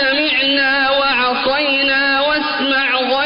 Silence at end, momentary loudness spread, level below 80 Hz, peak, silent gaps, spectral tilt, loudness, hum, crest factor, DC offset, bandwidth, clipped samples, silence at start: 0 s; 3 LU; -48 dBFS; -6 dBFS; none; -6.5 dB/octave; -14 LUFS; none; 10 dB; under 0.1%; 5.4 kHz; under 0.1%; 0 s